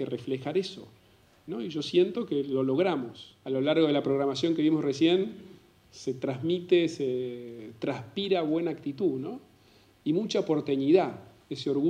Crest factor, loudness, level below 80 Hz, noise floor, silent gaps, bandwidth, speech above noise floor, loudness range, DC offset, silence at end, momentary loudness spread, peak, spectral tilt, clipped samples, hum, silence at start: 20 dB; -28 LUFS; -72 dBFS; -60 dBFS; none; 9.6 kHz; 32 dB; 4 LU; under 0.1%; 0 s; 15 LU; -10 dBFS; -6.5 dB/octave; under 0.1%; none; 0 s